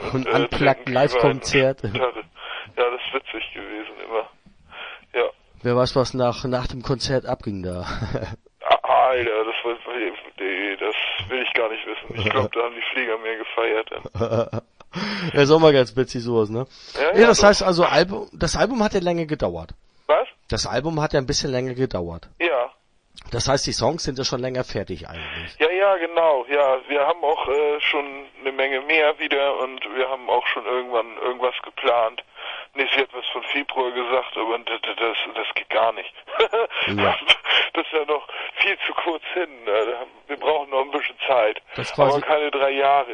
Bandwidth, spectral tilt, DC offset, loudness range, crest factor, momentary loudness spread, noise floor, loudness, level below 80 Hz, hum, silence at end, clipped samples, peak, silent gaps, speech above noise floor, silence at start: 10.5 kHz; -4.5 dB/octave; under 0.1%; 6 LU; 22 dB; 12 LU; -52 dBFS; -21 LUFS; -46 dBFS; none; 0 s; under 0.1%; 0 dBFS; none; 31 dB; 0 s